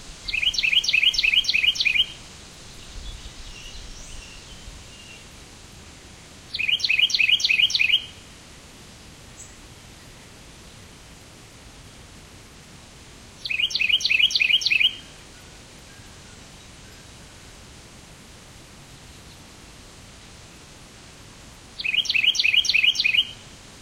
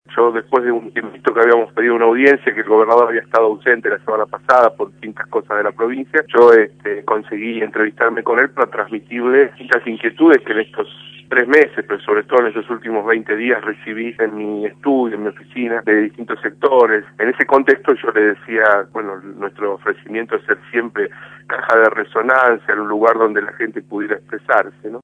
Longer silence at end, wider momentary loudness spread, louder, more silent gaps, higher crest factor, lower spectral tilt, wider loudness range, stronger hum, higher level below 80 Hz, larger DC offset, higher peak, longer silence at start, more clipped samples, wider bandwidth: about the same, 0 s vs 0.05 s; first, 25 LU vs 12 LU; about the same, -18 LUFS vs -16 LUFS; neither; about the same, 20 dB vs 16 dB; second, 0.5 dB/octave vs -6.5 dB/octave; first, 24 LU vs 5 LU; neither; first, -48 dBFS vs -68 dBFS; neither; second, -6 dBFS vs 0 dBFS; about the same, 0 s vs 0.1 s; second, under 0.1% vs 0.1%; first, 16 kHz vs 6.8 kHz